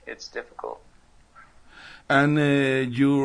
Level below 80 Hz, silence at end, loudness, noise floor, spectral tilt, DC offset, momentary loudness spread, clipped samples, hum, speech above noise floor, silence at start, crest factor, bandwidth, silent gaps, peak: -58 dBFS; 0 s; -22 LUFS; -52 dBFS; -6.5 dB/octave; under 0.1%; 18 LU; under 0.1%; none; 30 dB; 0.05 s; 16 dB; 10.5 kHz; none; -8 dBFS